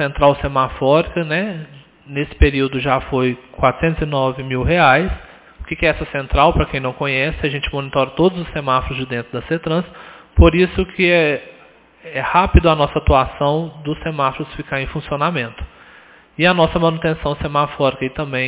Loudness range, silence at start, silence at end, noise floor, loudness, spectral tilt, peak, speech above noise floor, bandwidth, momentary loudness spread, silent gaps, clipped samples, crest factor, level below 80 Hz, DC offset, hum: 3 LU; 0 s; 0 s; -47 dBFS; -17 LUFS; -10 dB/octave; 0 dBFS; 30 dB; 4 kHz; 11 LU; none; under 0.1%; 18 dB; -26 dBFS; under 0.1%; none